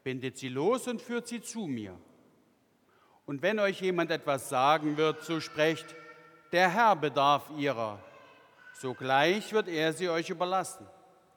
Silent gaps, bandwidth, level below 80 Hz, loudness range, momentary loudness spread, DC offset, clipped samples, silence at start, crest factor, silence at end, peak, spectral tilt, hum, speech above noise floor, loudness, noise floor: none; 19 kHz; -82 dBFS; 7 LU; 14 LU; under 0.1%; under 0.1%; 0.05 s; 20 dB; 0.5 s; -10 dBFS; -4.5 dB/octave; none; 38 dB; -30 LUFS; -68 dBFS